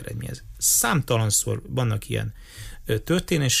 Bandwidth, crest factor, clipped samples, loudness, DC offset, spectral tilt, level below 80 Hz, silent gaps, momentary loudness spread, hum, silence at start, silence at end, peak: 15.5 kHz; 16 dB; under 0.1%; -23 LUFS; under 0.1%; -3.5 dB/octave; -42 dBFS; none; 17 LU; none; 0 s; 0 s; -10 dBFS